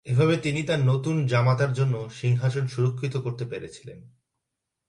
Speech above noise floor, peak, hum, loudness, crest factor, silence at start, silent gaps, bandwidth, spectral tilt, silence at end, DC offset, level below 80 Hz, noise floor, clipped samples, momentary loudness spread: 59 dB; -10 dBFS; none; -25 LUFS; 16 dB; 0.05 s; none; 10.5 kHz; -7 dB/octave; 0.8 s; under 0.1%; -60 dBFS; -83 dBFS; under 0.1%; 13 LU